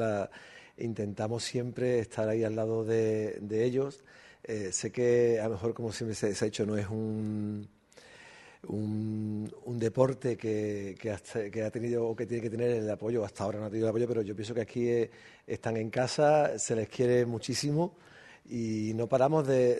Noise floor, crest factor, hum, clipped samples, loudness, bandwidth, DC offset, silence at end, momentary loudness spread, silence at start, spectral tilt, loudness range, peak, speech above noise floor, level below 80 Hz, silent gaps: -56 dBFS; 20 dB; none; under 0.1%; -31 LUFS; 12 kHz; under 0.1%; 0 s; 11 LU; 0 s; -6 dB/octave; 5 LU; -10 dBFS; 25 dB; -66 dBFS; none